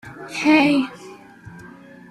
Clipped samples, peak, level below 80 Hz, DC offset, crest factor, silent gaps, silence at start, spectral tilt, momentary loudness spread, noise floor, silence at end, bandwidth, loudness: under 0.1%; -4 dBFS; -60 dBFS; under 0.1%; 18 dB; none; 0.05 s; -4.5 dB/octave; 26 LU; -42 dBFS; 0.45 s; 12 kHz; -18 LUFS